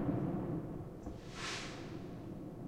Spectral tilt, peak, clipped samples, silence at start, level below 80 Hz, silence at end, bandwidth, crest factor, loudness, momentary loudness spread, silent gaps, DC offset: -5.5 dB/octave; -24 dBFS; under 0.1%; 0 s; -56 dBFS; 0 s; 16 kHz; 18 dB; -43 LUFS; 9 LU; none; under 0.1%